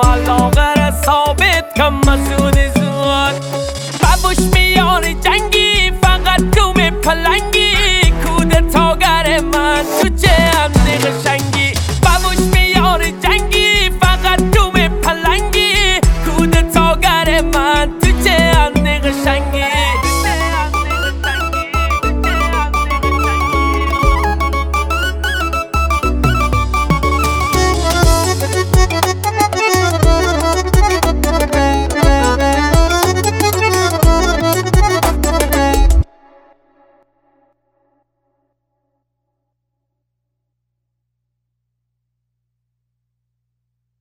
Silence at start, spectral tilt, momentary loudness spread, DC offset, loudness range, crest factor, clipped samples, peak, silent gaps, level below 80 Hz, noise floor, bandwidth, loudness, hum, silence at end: 0 s; -4.5 dB/octave; 5 LU; under 0.1%; 4 LU; 12 dB; under 0.1%; 0 dBFS; none; -18 dBFS; -73 dBFS; 19.5 kHz; -13 LUFS; 60 Hz at -35 dBFS; 7.95 s